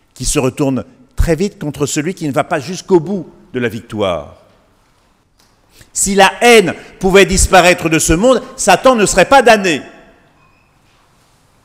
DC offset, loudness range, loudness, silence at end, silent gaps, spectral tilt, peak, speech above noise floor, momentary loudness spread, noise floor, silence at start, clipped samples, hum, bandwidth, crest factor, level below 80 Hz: under 0.1%; 10 LU; -12 LUFS; 1.75 s; none; -3.5 dB/octave; 0 dBFS; 42 dB; 12 LU; -54 dBFS; 0.2 s; 0.4%; none; 16.5 kHz; 14 dB; -28 dBFS